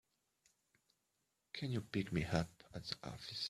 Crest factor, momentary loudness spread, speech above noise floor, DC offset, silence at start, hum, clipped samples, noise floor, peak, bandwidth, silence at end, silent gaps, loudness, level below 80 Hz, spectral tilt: 26 dB; 10 LU; 44 dB; under 0.1%; 1.55 s; none; under 0.1%; -85 dBFS; -20 dBFS; 14 kHz; 0 s; none; -43 LUFS; -66 dBFS; -5.5 dB/octave